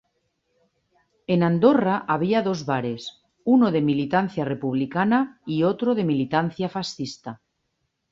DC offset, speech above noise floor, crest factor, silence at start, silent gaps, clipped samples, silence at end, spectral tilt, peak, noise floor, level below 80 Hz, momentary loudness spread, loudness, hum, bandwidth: under 0.1%; 53 dB; 20 dB; 1.3 s; none; under 0.1%; 0.75 s; -7 dB/octave; -4 dBFS; -75 dBFS; -64 dBFS; 14 LU; -23 LUFS; none; 7.6 kHz